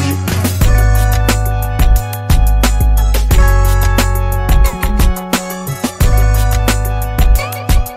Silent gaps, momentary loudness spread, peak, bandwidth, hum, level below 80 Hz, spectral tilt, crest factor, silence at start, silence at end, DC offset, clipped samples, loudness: none; 5 LU; 0 dBFS; 16 kHz; none; -12 dBFS; -5 dB/octave; 10 dB; 0 s; 0 s; under 0.1%; under 0.1%; -14 LUFS